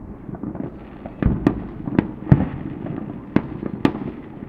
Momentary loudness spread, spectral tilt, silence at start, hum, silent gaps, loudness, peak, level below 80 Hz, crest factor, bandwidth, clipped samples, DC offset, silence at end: 14 LU; -10 dB/octave; 0 s; none; none; -24 LUFS; 0 dBFS; -36 dBFS; 24 dB; 6.4 kHz; under 0.1%; under 0.1%; 0 s